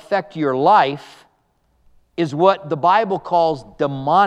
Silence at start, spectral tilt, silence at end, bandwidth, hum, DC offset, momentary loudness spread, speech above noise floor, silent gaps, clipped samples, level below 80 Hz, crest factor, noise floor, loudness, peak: 0.1 s; -6.5 dB/octave; 0 s; 9.4 kHz; none; under 0.1%; 10 LU; 46 dB; none; under 0.1%; -58 dBFS; 18 dB; -63 dBFS; -18 LUFS; 0 dBFS